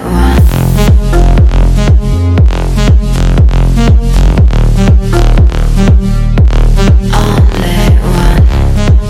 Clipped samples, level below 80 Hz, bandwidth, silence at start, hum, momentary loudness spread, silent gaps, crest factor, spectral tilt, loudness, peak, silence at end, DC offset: 8%; -8 dBFS; 15.5 kHz; 0 s; none; 2 LU; none; 6 dB; -7 dB/octave; -9 LUFS; 0 dBFS; 0 s; under 0.1%